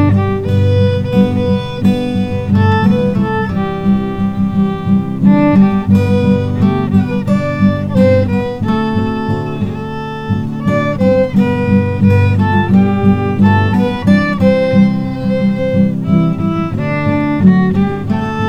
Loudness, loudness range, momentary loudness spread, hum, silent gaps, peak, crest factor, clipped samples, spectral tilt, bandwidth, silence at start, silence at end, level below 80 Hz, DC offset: -13 LUFS; 3 LU; 6 LU; none; none; 0 dBFS; 12 dB; under 0.1%; -9 dB/octave; 7 kHz; 0 s; 0 s; -36 dBFS; 1%